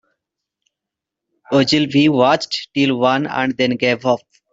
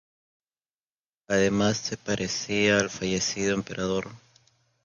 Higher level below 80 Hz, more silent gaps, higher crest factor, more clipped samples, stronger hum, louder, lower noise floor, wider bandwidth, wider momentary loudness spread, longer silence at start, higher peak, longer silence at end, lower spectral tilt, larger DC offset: about the same, -60 dBFS vs -56 dBFS; neither; second, 16 dB vs 22 dB; neither; neither; first, -16 LUFS vs -26 LUFS; second, -84 dBFS vs under -90 dBFS; second, 7.8 kHz vs 9.8 kHz; about the same, 7 LU vs 8 LU; first, 1.5 s vs 1.3 s; first, -2 dBFS vs -8 dBFS; second, 0.35 s vs 0.7 s; first, -5.5 dB/octave vs -4 dB/octave; neither